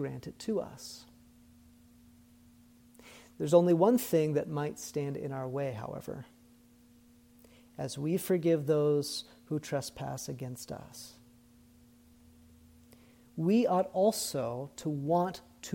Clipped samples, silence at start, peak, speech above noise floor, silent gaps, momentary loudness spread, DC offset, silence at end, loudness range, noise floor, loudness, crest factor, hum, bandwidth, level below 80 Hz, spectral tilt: under 0.1%; 0 s; -10 dBFS; 29 dB; none; 20 LU; under 0.1%; 0 s; 12 LU; -61 dBFS; -32 LUFS; 22 dB; none; 17.5 kHz; -68 dBFS; -6 dB/octave